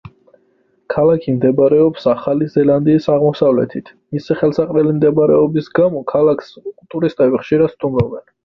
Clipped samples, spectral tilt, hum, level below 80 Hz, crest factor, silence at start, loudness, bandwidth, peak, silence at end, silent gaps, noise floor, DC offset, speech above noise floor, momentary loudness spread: under 0.1%; -9.5 dB/octave; none; -48 dBFS; 14 dB; 0.05 s; -15 LUFS; 6.2 kHz; -2 dBFS; 0.25 s; none; -59 dBFS; under 0.1%; 44 dB; 11 LU